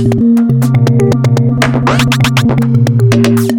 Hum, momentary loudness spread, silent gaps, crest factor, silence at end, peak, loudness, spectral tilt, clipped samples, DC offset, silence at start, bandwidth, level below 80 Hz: none; 2 LU; none; 8 dB; 0 s; 0 dBFS; -10 LUFS; -6.5 dB/octave; under 0.1%; under 0.1%; 0 s; 17 kHz; -34 dBFS